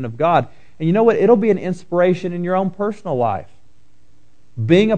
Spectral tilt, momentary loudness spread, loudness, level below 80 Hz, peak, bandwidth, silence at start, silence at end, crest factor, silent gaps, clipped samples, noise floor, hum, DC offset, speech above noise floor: -8 dB/octave; 11 LU; -18 LUFS; -56 dBFS; 0 dBFS; 9 kHz; 0 s; 0 s; 18 dB; none; under 0.1%; -56 dBFS; none; 1%; 40 dB